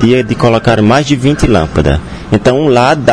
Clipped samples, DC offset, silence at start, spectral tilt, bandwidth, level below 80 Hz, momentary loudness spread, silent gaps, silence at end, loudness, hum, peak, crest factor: 2%; 1%; 0 s; -6.5 dB/octave; 11 kHz; -24 dBFS; 4 LU; none; 0 s; -10 LUFS; none; 0 dBFS; 8 dB